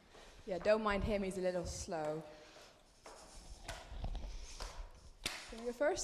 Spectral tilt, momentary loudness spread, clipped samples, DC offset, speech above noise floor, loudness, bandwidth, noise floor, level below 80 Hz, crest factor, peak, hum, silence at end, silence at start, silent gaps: -4.5 dB/octave; 23 LU; under 0.1%; under 0.1%; 24 dB; -40 LUFS; 14.5 kHz; -61 dBFS; -52 dBFS; 20 dB; -22 dBFS; none; 0 s; 0.1 s; none